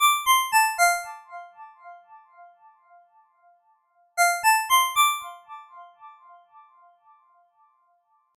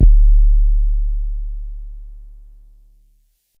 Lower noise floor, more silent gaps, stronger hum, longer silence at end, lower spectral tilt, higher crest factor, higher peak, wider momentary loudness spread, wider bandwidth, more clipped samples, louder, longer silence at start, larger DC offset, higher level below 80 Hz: first, -67 dBFS vs -59 dBFS; neither; neither; first, 2.3 s vs 1.4 s; second, 4 dB/octave vs -11.5 dB/octave; about the same, 18 dB vs 14 dB; second, -8 dBFS vs -2 dBFS; about the same, 25 LU vs 23 LU; first, 17 kHz vs 0.6 kHz; neither; about the same, -21 LUFS vs -19 LUFS; about the same, 0 s vs 0 s; neither; second, -70 dBFS vs -14 dBFS